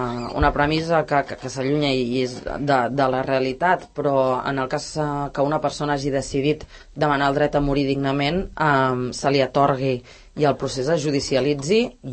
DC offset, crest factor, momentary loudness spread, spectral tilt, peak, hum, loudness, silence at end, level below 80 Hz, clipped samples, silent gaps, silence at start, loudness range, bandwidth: under 0.1%; 16 dB; 6 LU; -5.5 dB/octave; -4 dBFS; none; -21 LUFS; 0 s; -40 dBFS; under 0.1%; none; 0 s; 2 LU; 8.8 kHz